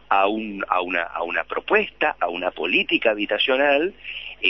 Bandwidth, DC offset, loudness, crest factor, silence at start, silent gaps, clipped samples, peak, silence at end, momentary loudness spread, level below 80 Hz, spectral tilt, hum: 6 kHz; 0.2%; -21 LUFS; 20 dB; 0.1 s; none; under 0.1%; -2 dBFS; 0 s; 7 LU; -56 dBFS; -6.5 dB/octave; none